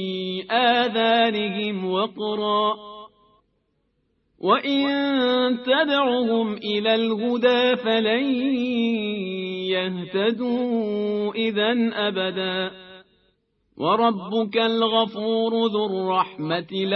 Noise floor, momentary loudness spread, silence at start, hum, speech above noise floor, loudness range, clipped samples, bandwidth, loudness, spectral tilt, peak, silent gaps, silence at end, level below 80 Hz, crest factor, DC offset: -70 dBFS; 7 LU; 0 s; none; 48 dB; 4 LU; under 0.1%; 6.2 kHz; -22 LUFS; -7 dB/octave; -6 dBFS; none; 0 s; -68 dBFS; 18 dB; under 0.1%